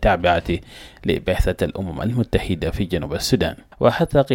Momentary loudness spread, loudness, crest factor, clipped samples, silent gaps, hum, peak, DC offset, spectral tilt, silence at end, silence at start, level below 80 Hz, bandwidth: 7 LU; -21 LUFS; 18 dB; under 0.1%; none; none; -4 dBFS; under 0.1%; -6 dB/octave; 0 s; 0 s; -30 dBFS; 17 kHz